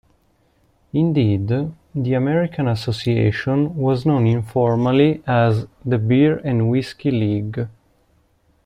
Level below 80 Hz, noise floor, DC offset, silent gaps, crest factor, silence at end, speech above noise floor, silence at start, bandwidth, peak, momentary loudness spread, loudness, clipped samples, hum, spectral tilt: -50 dBFS; -60 dBFS; under 0.1%; none; 16 dB; 0.95 s; 42 dB; 0.95 s; 9.8 kHz; -4 dBFS; 8 LU; -19 LUFS; under 0.1%; none; -8.5 dB/octave